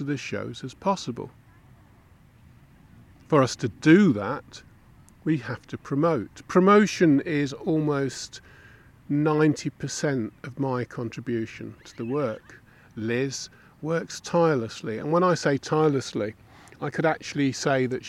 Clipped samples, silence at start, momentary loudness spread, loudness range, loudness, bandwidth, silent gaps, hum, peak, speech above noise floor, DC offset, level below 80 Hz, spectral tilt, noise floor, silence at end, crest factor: under 0.1%; 0 s; 17 LU; 8 LU; -25 LUFS; 12.5 kHz; none; none; -6 dBFS; 30 dB; under 0.1%; -60 dBFS; -6 dB/octave; -55 dBFS; 0 s; 20 dB